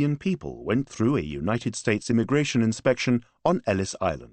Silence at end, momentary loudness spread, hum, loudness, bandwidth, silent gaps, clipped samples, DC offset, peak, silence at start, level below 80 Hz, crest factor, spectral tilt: 0.05 s; 5 LU; none; -25 LUFS; 8.8 kHz; none; under 0.1%; under 0.1%; -8 dBFS; 0 s; -50 dBFS; 18 dB; -6 dB/octave